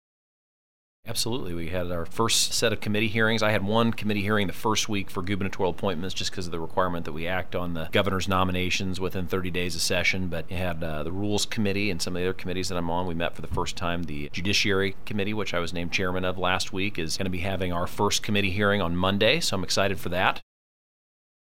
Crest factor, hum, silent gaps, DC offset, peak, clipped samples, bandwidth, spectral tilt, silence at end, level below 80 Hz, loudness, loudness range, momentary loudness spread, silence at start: 22 dB; none; none; 3%; -6 dBFS; under 0.1%; 16 kHz; -4 dB/octave; 1 s; -46 dBFS; -27 LUFS; 4 LU; 8 LU; 1 s